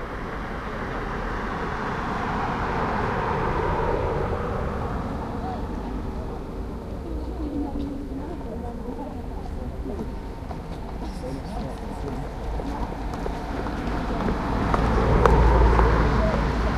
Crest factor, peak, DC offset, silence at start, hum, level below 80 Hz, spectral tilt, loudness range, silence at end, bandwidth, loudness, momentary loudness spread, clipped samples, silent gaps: 24 dB; 0 dBFS; under 0.1%; 0 s; none; -28 dBFS; -7.5 dB/octave; 11 LU; 0 s; 10.5 kHz; -27 LUFS; 14 LU; under 0.1%; none